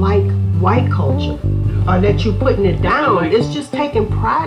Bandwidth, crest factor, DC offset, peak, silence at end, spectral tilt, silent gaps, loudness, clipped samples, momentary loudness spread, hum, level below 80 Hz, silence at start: 9.6 kHz; 14 dB; under 0.1%; 0 dBFS; 0 s; -8 dB/octave; none; -15 LUFS; under 0.1%; 5 LU; none; -26 dBFS; 0 s